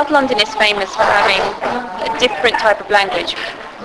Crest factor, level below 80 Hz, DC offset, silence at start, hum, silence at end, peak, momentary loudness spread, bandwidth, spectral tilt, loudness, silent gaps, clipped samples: 16 dB; -46 dBFS; under 0.1%; 0 s; none; 0 s; 0 dBFS; 9 LU; 11 kHz; -2.5 dB/octave; -15 LUFS; none; under 0.1%